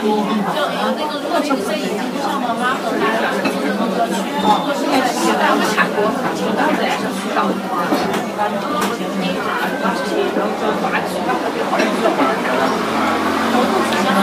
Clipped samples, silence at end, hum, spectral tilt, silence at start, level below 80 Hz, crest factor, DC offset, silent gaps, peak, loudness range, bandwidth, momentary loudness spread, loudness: under 0.1%; 0 s; none; -4.5 dB/octave; 0 s; -58 dBFS; 16 dB; under 0.1%; none; 0 dBFS; 2 LU; 15.5 kHz; 4 LU; -18 LUFS